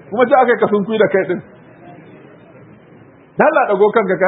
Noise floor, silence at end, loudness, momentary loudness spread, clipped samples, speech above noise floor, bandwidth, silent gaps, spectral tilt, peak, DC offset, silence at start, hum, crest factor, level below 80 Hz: -43 dBFS; 0 s; -14 LUFS; 9 LU; under 0.1%; 30 dB; 4 kHz; none; -10 dB/octave; 0 dBFS; under 0.1%; 0.1 s; none; 16 dB; -66 dBFS